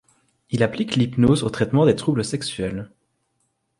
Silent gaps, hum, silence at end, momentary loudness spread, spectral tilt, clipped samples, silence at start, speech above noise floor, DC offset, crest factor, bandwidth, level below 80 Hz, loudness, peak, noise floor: none; none; 0.95 s; 11 LU; -6.5 dB/octave; under 0.1%; 0.5 s; 51 dB; under 0.1%; 18 dB; 11.5 kHz; -48 dBFS; -21 LUFS; -4 dBFS; -71 dBFS